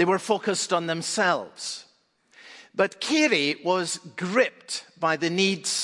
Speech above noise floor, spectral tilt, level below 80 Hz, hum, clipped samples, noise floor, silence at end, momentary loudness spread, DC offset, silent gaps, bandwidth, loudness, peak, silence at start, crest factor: 38 dB; -3 dB/octave; -78 dBFS; none; under 0.1%; -63 dBFS; 0 s; 12 LU; under 0.1%; none; 11.5 kHz; -25 LUFS; -8 dBFS; 0 s; 18 dB